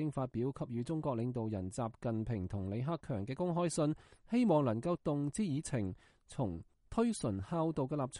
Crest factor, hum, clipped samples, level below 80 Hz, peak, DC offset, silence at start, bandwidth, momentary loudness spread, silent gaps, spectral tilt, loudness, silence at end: 16 dB; none; under 0.1%; -60 dBFS; -20 dBFS; under 0.1%; 0 s; 11.5 kHz; 7 LU; none; -7 dB/octave; -37 LUFS; 0 s